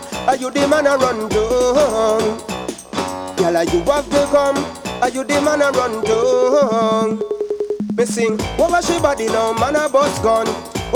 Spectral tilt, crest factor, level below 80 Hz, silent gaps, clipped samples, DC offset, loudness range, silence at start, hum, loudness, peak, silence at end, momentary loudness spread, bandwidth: -4.5 dB/octave; 14 dB; -40 dBFS; none; under 0.1%; under 0.1%; 2 LU; 0 s; none; -17 LUFS; -2 dBFS; 0 s; 8 LU; 19 kHz